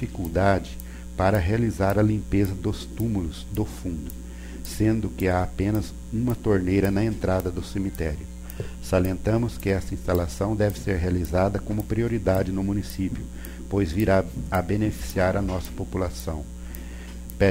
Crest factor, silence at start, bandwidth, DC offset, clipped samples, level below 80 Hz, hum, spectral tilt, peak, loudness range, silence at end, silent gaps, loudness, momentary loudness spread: 18 dB; 0 s; 16 kHz; under 0.1%; under 0.1%; -36 dBFS; none; -7 dB/octave; -8 dBFS; 3 LU; 0 s; none; -25 LUFS; 14 LU